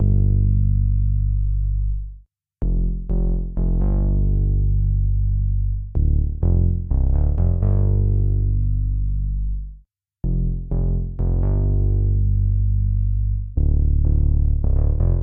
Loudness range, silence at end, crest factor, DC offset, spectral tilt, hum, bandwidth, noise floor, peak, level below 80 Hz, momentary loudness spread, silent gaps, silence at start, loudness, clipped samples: 3 LU; 0 s; 10 dB; under 0.1%; -15.5 dB/octave; none; 1.4 kHz; -49 dBFS; -8 dBFS; -20 dBFS; 6 LU; none; 0 s; -22 LUFS; under 0.1%